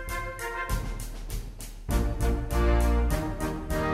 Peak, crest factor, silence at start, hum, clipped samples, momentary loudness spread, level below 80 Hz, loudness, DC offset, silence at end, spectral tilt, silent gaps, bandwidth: -12 dBFS; 16 dB; 0 s; none; under 0.1%; 14 LU; -30 dBFS; -30 LUFS; under 0.1%; 0 s; -6 dB/octave; none; 16 kHz